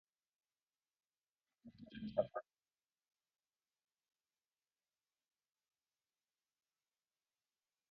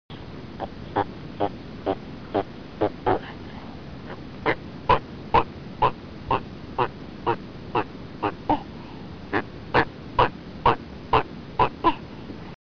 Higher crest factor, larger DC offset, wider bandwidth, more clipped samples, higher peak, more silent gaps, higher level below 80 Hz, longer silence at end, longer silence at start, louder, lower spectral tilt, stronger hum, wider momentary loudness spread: first, 32 dB vs 20 dB; second, under 0.1% vs 0.4%; second, 4.9 kHz vs 5.4 kHz; neither; second, -22 dBFS vs -8 dBFS; neither; second, -82 dBFS vs -44 dBFS; first, 5.5 s vs 0.1 s; first, 1.65 s vs 0.1 s; second, -44 LUFS vs -27 LUFS; second, -5.5 dB/octave vs -7.5 dB/octave; neither; first, 23 LU vs 15 LU